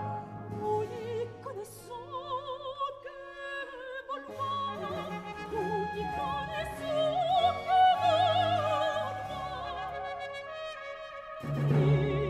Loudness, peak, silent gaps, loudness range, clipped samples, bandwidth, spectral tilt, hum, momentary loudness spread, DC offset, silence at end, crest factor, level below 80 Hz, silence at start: -32 LUFS; -16 dBFS; none; 10 LU; under 0.1%; 14 kHz; -6.5 dB/octave; none; 15 LU; under 0.1%; 0 s; 16 dB; -56 dBFS; 0 s